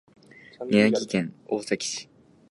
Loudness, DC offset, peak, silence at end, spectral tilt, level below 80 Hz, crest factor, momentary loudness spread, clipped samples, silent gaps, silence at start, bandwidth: -25 LUFS; under 0.1%; -6 dBFS; 0.45 s; -4.5 dB/octave; -68 dBFS; 20 dB; 13 LU; under 0.1%; none; 0.6 s; 11.5 kHz